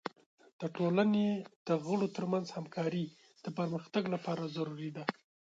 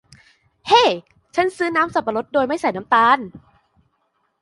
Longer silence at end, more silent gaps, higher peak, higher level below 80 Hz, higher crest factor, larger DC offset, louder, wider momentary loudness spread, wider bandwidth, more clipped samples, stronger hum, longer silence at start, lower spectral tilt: second, 0.35 s vs 1.05 s; first, 0.26-0.38 s, 0.53-0.59 s, 1.56-1.65 s vs none; second, -14 dBFS vs -2 dBFS; second, -80 dBFS vs -58 dBFS; about the same, 22 dB vs 18 dB; neither; second, -35 LUFS vs -18 LUFS; about the same, 12 LU vs 12 LU; second, 7.8 kHz vs 11.5 kHz; neither; neither; second, 0.05 s vs 0.65 s; first, -7 dB/octave vs -3.5 dB/octave